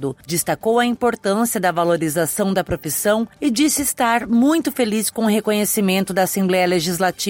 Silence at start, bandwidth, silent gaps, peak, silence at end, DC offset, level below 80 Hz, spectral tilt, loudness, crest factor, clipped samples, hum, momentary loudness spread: 0 s; 17 kHz; none; -6 dBFS; 0 s; under 0.1%; -50 dBFS; -4 dB/octave; -18 LUFS; 14 dB; under 0.1%; none; 3 LU